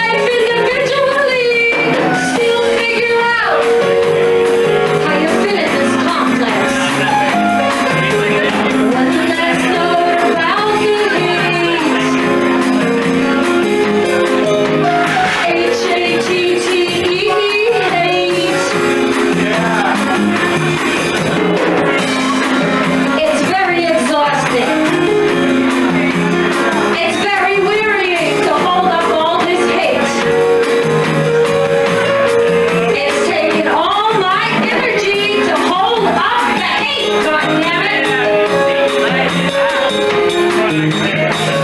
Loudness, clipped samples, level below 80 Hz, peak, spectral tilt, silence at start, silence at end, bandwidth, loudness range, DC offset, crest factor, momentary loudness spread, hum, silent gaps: -13 LUFS; under 0.1%; -48 dBFS; -2 dBFS; -4.5 dB/octave; 0 s; 0 s; 13 kHz; 1 LU; under 0.1%; 12 dB; 2 LU; none; none